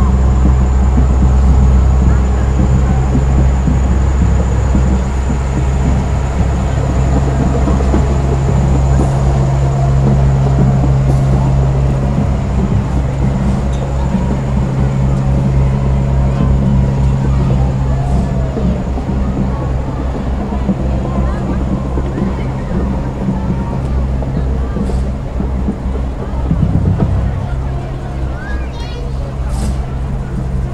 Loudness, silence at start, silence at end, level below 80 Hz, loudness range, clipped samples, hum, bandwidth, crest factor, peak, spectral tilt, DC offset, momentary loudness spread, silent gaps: -14 LUFS; 0 s; 0 s; -16 dBFS; 5 LU; under 0.1%; none; 8.6 kHz; 12 dB; 0 dBFS; -8 dB/octave; 1%; 8 LU; none